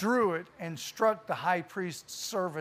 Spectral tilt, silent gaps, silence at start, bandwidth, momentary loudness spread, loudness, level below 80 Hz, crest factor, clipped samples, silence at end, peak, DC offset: -4.5 dB/octave; none; 0 s; 15.5 kHz; 10 LU; -32 LUFS; -74 dBFS; 18 dB; under 0.1%; 0 s; -14 dBFS; under 0.1%